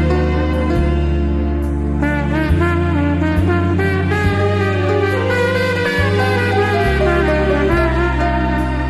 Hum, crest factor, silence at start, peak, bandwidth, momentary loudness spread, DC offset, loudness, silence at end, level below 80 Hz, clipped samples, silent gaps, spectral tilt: none; 12 dB; 0 s; -2 dBFS; 12.5 kHz; 3 LU; under 0.1%; -16 LUFS; 0 s; -22 dBFS; under 0.1%; none; -7.5 dB/octave